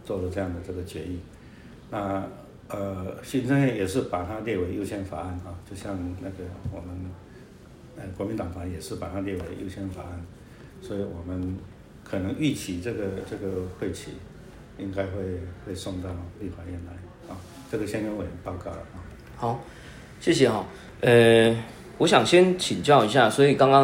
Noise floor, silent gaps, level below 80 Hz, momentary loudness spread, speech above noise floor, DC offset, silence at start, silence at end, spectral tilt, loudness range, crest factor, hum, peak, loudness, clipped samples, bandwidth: -47 dBFS; none; -52 dBFS; 23 LU; 22 dB; under 0.1%; 0 s; 0 s; -5.5 dB/octave; 14 LU; 22 dB; none; -4 dBFS; -26 LUFS; under 0.1%; 16 kHz